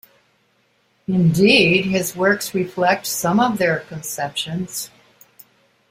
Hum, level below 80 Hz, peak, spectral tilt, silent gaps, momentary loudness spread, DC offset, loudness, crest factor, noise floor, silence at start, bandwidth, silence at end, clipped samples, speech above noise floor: none; -56 dBFS; -2 dBFS; -4.5 dB/octave; none; 15 LU; under 0.1%; -18 LUFS; 18 dB; -62 dBFS; 1.1 s; 16 kHz; 1.05 s; under 0.1%; 44 dB